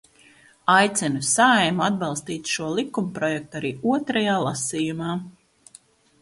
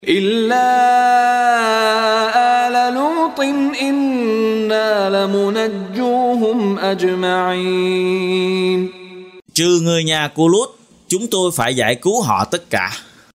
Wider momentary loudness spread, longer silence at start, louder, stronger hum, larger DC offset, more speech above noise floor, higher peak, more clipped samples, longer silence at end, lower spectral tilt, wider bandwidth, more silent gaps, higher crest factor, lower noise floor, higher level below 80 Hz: first, 11 LU vs 6 LU; first, 0.65 s vs 0.05 s; second, -22 LUFS vs -16 LUFS; neither; neither; first, 31 dB vs 20 dB; second, -4 dBFS vs 0 dBFS; neither; first, 0.9 s vs 0.35 s; about the same, -3.5 dB/octave vs -4 dB/octave; second, 11.5 kHz vs 16 kHz; neither; about the same, 20 dB vs 16 dB; first, -54 dBFS vs -36 dBFS; about the same, -62 dBFS vs -58 dBFS